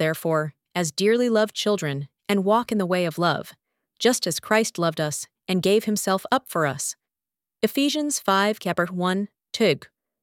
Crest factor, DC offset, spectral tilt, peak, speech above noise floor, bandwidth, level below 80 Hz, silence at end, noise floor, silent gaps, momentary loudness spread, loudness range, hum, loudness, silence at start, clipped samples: 20 dB; under 0.1%; -4 dB/octave; -4 dBFS; over 67 dB; 17.5 kHz; -68 dBFS; 0.35 s; under -90 dBFS; none; 8 LU; 1 LU; none; -23 LUFS; 0 s; under 0.1%